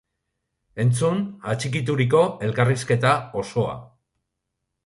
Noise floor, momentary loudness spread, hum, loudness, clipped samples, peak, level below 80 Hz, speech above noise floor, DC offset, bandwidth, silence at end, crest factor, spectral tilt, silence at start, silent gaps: -80 dBFS; 8 LU; none; -22 LUFS; under 0.1%; -4 dBFS; -56 dBFS; 58 dB; under 0.1%; 11.5 kHz; 1 s; 18 dB; -6 dB/octave; 0.75 s; none